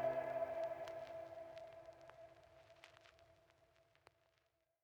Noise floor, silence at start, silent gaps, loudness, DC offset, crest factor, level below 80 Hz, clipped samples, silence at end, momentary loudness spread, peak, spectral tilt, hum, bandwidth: -83 dBFS; 0 s; none; -47 LUFS; under 0.1%; 20 dB; -80 dBFS; under 0.1%; 1.5 s; 23 LU; -30 dBFS; -5.5 dB/octave; none; 19 kHz